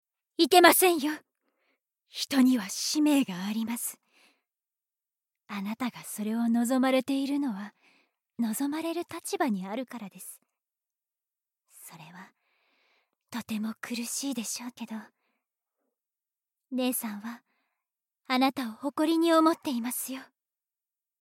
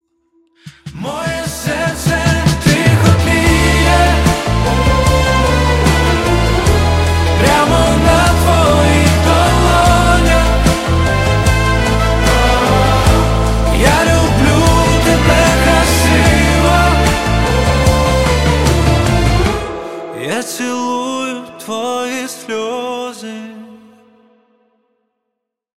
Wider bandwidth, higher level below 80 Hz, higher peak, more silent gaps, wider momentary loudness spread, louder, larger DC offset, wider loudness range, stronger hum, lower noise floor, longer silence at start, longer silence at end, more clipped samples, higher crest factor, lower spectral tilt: about the same, 16.5 kHz vs 16 kHz; second, -86 dBFS vs -18 dBFS; second, -6 dBFS vs 0 dBFS; neither; first, 19 LU vs 10 LU; second, -28 LUFS vs -12 LUFS; neither; about the same, 10 LU vs 10 LU; neither; first, under -90 dBFS vs -76 dBFS; second, 0.4 s vs 0.65 s; second, 0.95 s vs 2 s; neither; first, 26 dB vs 12 dB; second, -3 dB/octave vs -5 dB/octave